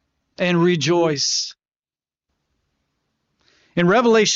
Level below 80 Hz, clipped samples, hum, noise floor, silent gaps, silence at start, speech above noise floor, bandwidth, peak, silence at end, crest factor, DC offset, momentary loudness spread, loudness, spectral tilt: -64 dBFS; under 0.1%; none; under -90 dBFS; 1.76-1.80 s; 0.4 s; over 73 dB; 7.8 kHz; -6 dBFS; 0 s; 14 dB; under 0.1%; 10 LU; -18 LUFS; -4 dB/octave